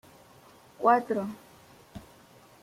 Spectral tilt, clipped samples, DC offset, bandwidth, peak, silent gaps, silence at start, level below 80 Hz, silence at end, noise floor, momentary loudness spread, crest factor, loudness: -6.5 dB/octave; under 0.1%; under 0.1%; 16 kHz; -10 dBFS; none; 0.8 s; -66 dBFS; 0.65 s; -56 dBFS; 25 LU; 22 dB; -27 LUFS